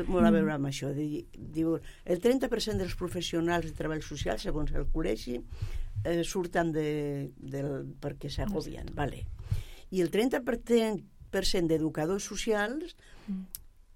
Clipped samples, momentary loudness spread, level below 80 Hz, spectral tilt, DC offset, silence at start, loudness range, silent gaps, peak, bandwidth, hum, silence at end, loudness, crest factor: under 0.1%; 12 LU; -40 dBFS; -5.5 dB/octave; under 0.1%; 0 s; 4 LU; none; -12 dBFS; 16.5 kHz; none; 0.15 s; -32 LUFS; 18 dB